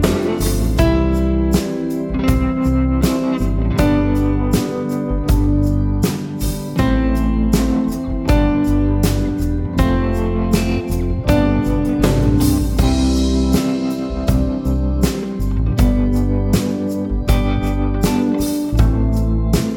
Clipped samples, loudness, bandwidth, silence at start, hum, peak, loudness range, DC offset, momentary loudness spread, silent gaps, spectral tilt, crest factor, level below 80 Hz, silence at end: under 0.1%; -17 LUFS; 18 kHz; 0 s; none; 0 dBFS; 2 LU; under 0.1%; 5 LU; none; -6.5 dB/octave; 16 dB; -20 dBFS; 0 s